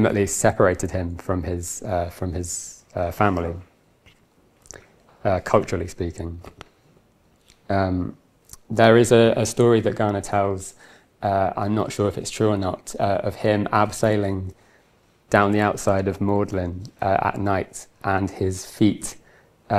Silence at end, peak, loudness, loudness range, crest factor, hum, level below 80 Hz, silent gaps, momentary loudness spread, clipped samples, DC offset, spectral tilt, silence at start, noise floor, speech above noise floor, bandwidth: 0 s; 0 dBFS; -22 LUFS; 8 LU; 22 dB; none; -50 dBFS; none; 12 LU; under 0.1%; under 0.1%; -5.5 dB/octave; 0 s; -59 dBFS; 38 dB; 15 kHz